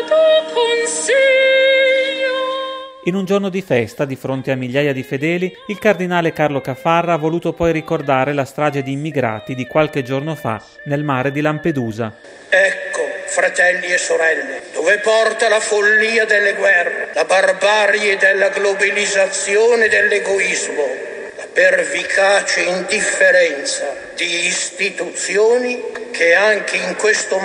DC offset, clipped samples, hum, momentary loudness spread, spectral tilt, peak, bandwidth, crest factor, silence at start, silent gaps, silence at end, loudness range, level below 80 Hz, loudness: under 0.1%; under 0.1%; none; 10 LU; -3.5 dB/octave; 0 dBFS; 15 kHz; 16 dB; 0 s; none; 0 s; 6 LU; -54 dBFS; -15 LUFS